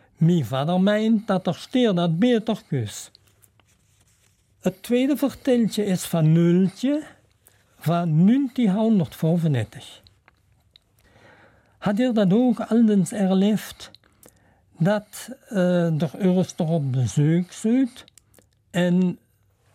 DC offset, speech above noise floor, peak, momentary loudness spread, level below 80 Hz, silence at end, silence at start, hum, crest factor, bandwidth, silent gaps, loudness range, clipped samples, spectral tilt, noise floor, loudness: under 0.1%; 41 dB; -8 dBFS; 10 LU; -62 dBFS; 0.6 s; 0.2 s; none; 14 dB; 16 kHz; none; 4 LU; under 0.1%; -7 dB/octave; -62 dBFS; -22 LUFS